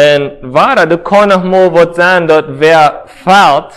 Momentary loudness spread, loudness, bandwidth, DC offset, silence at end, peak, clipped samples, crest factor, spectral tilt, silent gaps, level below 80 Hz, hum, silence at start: 5 LU; -8 LUFS; 14 kHz; under 0.1%; 0.1 s; 0 dBFS; 3%; 8 dB; -5 dB/octave; none; -44 dBFS; none; 0 s